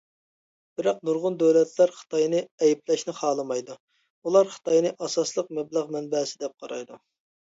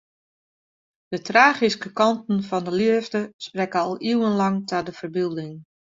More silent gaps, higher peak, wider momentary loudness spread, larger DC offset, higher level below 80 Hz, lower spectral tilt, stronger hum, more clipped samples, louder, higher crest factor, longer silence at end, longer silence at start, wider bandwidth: first, 2.51-2.58 s, 3.80-3.88 s, 4.10-4.22 s vs 3.33-3.39 s; second, -8 dBFS vs -2 dBFS; about the same, 15 LU vs 14 LU; neither; second, -76 dBFS vs -66 dBFS; about the same, -4.5 dB/octave vs -5.5 dB/octave; neither; neither; second, -25 LUFS vs -22 LUFS; about the same, 18 dB vs 22 dB; first, 0.5 s vs 0.35 s; second, 0.8 s vs 1.1 s; about the same, 8 kHz vs 7.8 kHz